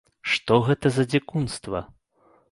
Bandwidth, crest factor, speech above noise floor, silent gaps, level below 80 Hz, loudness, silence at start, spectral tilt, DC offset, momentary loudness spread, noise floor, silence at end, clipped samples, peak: 11.5 kHz; 20 dB; 38 dB; none; -52 dBFS; -24 LUFS; 0.25 s; -6 dB/octave; under 0.1%; 11 LU; -61 dBFS; 0.65 s; under 0.1%; -4 dBFS